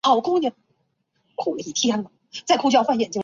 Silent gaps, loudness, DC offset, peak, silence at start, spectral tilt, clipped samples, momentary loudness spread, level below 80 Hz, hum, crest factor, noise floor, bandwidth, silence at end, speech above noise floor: none; -22 LUFS; under 0.1%; -4 dBFS; 0.05 s; -3.5 dB/octave; under 0.1%; 15 LU; -68 dBFS; none; 18 dB; -71 dBFS; 7.8 kHz; 0 s; 50 dB